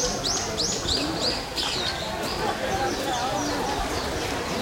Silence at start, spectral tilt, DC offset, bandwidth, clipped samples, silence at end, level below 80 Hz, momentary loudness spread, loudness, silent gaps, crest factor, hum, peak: 0 s; -2.5 dB/octave; under 0.1%; 16.5 kHz; under 0.1%; 0 s; -42 dBFS; 4 LU; -26 LUFS; none; 16 dB; none; -12 dBFS